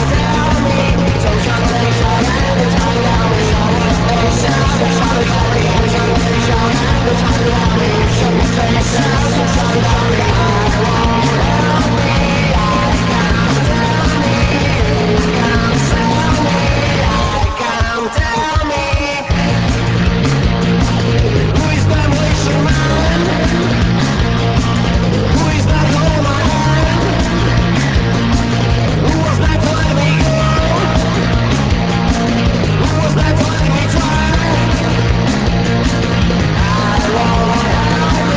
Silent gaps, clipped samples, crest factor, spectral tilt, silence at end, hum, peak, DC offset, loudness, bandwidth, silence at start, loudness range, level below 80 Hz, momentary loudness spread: none; under 0.1%; 12 dB; -5.5 dB/octave; 0 s; none; 0 dBFS; under 0.1%; -13 LUFS; 8 kHz; 0 s; 1 LU; -20 dBFS; 1 LU